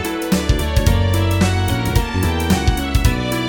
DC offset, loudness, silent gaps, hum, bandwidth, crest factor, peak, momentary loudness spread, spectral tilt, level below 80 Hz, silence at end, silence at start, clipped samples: under 0.1%; -17 LUFS; none; none; over 20 kHz; 14 dB; -2 dBFS; 3 LU; -5.5 dB/octave; -22 dBFS; 0 s; 0 s; under 0.1%